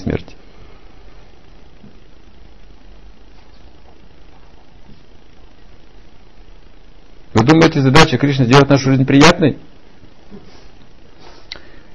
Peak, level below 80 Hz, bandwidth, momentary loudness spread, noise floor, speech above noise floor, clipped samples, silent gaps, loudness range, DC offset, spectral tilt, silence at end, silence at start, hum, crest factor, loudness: 0 dBFS; -38 dBFS; 12 kHz; 25 LU; -44 dBFS; 34 dB; 0.2%; none; 7 LU; 2%; -5.5 dB/octave; 0.4 s; 0 s; none; 18 dB; -11 LUFS